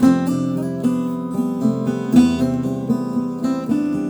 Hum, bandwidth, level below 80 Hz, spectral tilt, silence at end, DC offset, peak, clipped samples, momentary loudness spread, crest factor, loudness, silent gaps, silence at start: none; over 20 kHz; -48 dBFS; -7.5 dB/octave; 0 s; under 0.1%; -2 dBFS; under 0.1%; 8 LU; 16 dB; -20 LUFS; none; 0 s